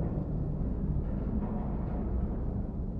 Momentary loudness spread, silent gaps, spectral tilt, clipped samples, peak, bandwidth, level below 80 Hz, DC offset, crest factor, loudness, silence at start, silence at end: 2 LU; none; -12.5 dB/octave; under 0.1%; -20 dBFS; 2.9 kHz; -36 dBFS; under 0.1%; 12 dB; -34 LUFS; 0 s; 0 s